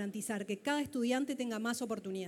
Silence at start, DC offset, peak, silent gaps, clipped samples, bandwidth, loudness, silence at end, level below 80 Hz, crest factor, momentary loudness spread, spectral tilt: 0 s; under 0.1%; -22 dBFS; none; under 0.1%; 17.5 kHz; -36 LUFS; 0 s; -78 dBFS; 14 dB; 4 LU; -4 dB/octave